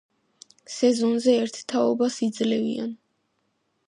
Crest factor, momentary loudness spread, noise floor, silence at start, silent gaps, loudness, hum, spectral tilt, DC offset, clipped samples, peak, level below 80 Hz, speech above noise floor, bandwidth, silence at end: 18 dB; 9 LU; -73 dBFS; 0.7 s; none; -24 LUFS; none; -4.5 dB/octave; under 0.1%; under 0.1%; -8 dBFS; -76 dBFS; 50 dB; 10.5 kHz; 0.9 s